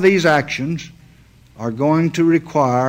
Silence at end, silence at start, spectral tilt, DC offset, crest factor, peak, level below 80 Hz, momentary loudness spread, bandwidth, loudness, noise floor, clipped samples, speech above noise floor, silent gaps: 0 s; 0 s; -6.5 dB/octave; under 0.1%; 14 dB; -2 dBFS; -52 dBFS; 13 LU; 16 kHz; -17 LUFS; -48 dBFS; under 0.1%; 32 dB; none